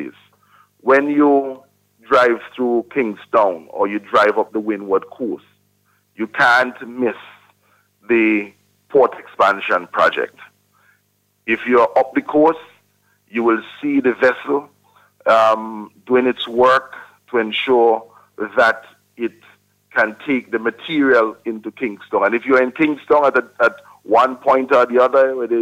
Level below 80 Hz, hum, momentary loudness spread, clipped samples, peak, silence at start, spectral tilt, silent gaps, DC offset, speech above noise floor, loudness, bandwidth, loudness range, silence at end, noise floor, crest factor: -64 dBFS; 50 Hz at -60 dBFS; 13 LU; under 0.1%; -2 dBFS; 0 s; -5.5 dB/octave; none; under 0.1%; 48 dB; -17 LUFS; 14.5 kHz; 3 LU; 0 s; -64 dBFS; 14 dB